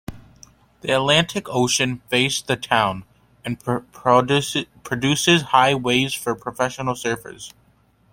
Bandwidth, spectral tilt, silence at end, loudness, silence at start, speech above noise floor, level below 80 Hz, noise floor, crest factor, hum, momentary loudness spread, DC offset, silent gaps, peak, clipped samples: 16.5 kHz; -3.5 dB/octave; 0.65 s; -20 LUFS; 0.1 s; 38 dB; -54 dBFS; -58 dBFS; 20 dB; none; 15 LU; under 0.1%; none; -2 dBFS; under 0.1%